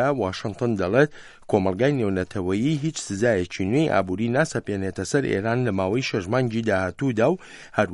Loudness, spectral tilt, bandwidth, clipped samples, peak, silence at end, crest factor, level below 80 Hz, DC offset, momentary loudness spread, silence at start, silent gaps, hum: -24 LUFS; -6 dB/octave; 11.5 kHz; under 0.1%; -4 dBFS; 0 s; 18 dB; -56 dBFS; under 0.1%; 6 LU; 0 s; none; none